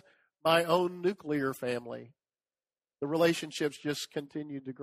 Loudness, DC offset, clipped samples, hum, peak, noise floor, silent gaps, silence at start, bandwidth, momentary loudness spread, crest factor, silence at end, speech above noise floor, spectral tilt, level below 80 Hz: -31 LUFS; under 0.1%; under 0.1%; none; -10 dBFS; under -90 dBFS; none; 0.45 s; 15.5 kHz; 13 LU; 22 dB; 0 s; over 59 dB; -5 dB/octave; -74 dBFS